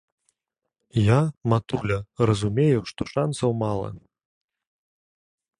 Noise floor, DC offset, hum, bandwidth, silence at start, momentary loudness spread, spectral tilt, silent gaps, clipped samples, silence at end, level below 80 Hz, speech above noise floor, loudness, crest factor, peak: -83 dBFS; under 0.1%; none; 11 kHz; 0.95 s; 8 LU; -7 dB/octave; none; under 0.1%; 1.6 s; -48 dBFS; 60 dB; -24 LUFS; 20 dB; -4 dBFS